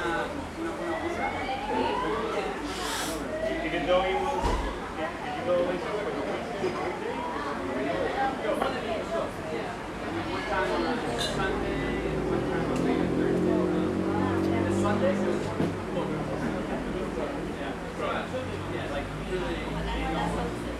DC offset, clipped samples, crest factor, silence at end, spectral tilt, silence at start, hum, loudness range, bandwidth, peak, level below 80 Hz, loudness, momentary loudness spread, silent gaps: under 0.1%; under 0.1%; 18 dB; 0 s; -5.5 dB/octave; 0 s; none; 5 LU; 15 kHz; -10 dBFS; -44 dBFS; -29 LUFS; 7 LU; none